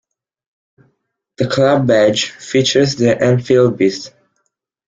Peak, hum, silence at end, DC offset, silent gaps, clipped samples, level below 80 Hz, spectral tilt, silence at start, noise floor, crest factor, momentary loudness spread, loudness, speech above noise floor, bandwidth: 0 dBFS; none; 0.8 s; under 0.1%; none; under 0.1%; -52 dBFS; -5.5 dB/octave; 1.4 s; -70 dBFS; 14 dB; 8 LU; -14 LUFS; 57 dB; 9.4 kHz